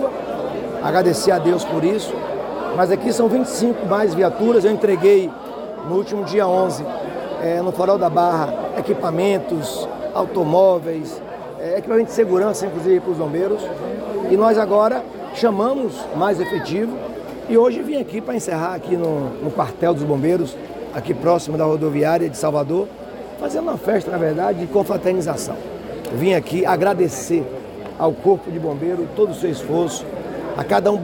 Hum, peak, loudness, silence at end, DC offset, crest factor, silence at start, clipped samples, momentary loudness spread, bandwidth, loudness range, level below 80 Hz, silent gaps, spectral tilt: none; -4 dBFS; -19 LUFS; 0 s; under 0.1%; 16 dB; 0 s; under 0.1%; 11 LU; 17 kHz; 3 LU; -52 dBFS; none; -6 dB/octave